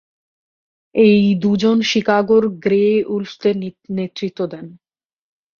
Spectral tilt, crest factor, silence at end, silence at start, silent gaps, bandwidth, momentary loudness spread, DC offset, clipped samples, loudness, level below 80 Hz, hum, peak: -6.5 dB/octave; 16 dB; 0.85 s; 0.95 s; none; 7 kHz; 12 LU; under 0.1%; under 0.1%; -17 LUFS; -58 dBFS; none; -2 dBFS